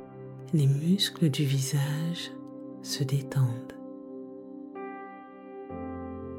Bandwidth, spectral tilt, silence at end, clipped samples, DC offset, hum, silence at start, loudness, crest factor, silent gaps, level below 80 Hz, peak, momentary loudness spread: 16.5 kHz; -5.5 dB/octave; 0 s; under 0.1%; under 0.1%; none; 0 s; -29 LUFS; 16 dB; none; -64 dBFS; -14 dBFS; 18 LU